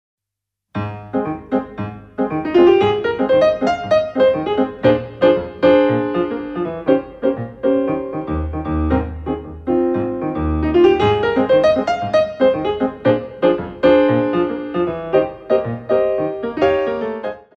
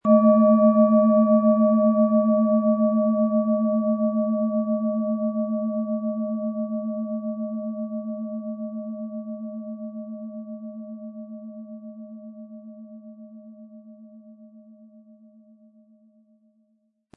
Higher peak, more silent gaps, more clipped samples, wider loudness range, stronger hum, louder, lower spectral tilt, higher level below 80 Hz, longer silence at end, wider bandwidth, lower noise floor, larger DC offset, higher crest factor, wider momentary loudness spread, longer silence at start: first, -2 dBFS vs -6 dBFS; neither; neither; second, 4 LU vs 23 LU; neither; first, -17 LUFS vs -22 LUFS; second, -8 dB/octave vs -14 dB/octave; first, -36 dBFS vs -86 dBFS; second, 0.2 s vs 2.55 s; first, 7 kHz vs 2.5 kHz; first, -83 dBFS vs -69 dBFS; neither; about the same, 16 dB vs 18 dB; second, 10 LU vs 23 LU; first, 0.75 s vs 0.05 s